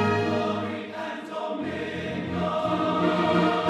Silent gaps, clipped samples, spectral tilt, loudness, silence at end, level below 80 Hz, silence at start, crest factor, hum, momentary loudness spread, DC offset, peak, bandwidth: none; under 0.1%; -6.5 dB/octave; -27 LUFS; 0 s; -58 dBFS; 0 s; 16 dB; none; 10 LU; under 0.1%; -10 dBFS; 11.5 kHz